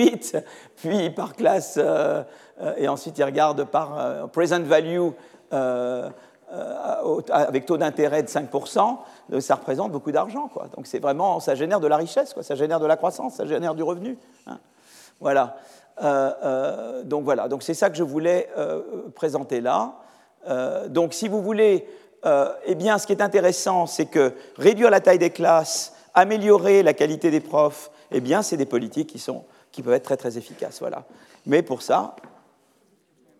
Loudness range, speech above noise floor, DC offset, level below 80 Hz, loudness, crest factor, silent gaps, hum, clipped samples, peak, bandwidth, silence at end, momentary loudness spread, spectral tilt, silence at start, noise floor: 7 LU; 40 dB; under 0.1%; -86 dBFS; -22 LUFS; 20 dB; none; none; under 0.1%; -2 dBFS; 15 kHz; 1.1 s; 14 LU; -5 dB/octave; 0 s; -62 dBFS